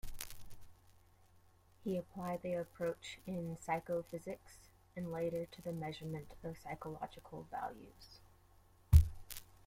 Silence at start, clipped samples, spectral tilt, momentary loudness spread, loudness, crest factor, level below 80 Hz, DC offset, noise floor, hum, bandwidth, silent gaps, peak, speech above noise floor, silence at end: 0.05 s; under 0.1%; -6.5 dB/octave; 15 LU; -41 LUFS; 28 dB; -46 dBFS; under 0.1%; -67 dBFS; none; 16.5 kHz; none; -12 dBFS; 23 dB; 0.25 s